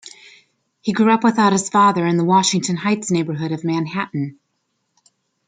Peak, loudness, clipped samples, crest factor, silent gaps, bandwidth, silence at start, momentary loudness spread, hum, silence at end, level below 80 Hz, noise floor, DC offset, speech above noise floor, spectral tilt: -2 dBFS; -18 LUFS; under 0.1%; 16 dB; none; 9.6 kHz; 0.05 s; 10 LU; none; 1.15 s; -64 dBFS; -71 dBFS; under 0.1%; 54 dB; -5 dB/octave